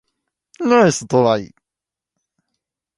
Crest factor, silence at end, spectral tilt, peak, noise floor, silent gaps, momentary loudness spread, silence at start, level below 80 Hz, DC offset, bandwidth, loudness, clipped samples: 20 dB; 1.5 s; -5 dB/octave; 0 dBFS; -87 dBFS; none; 9 LU; 0.6 s; -58 dBFS; under 0.1%; 11.5 kHz; -16 LUFS; under 0.1%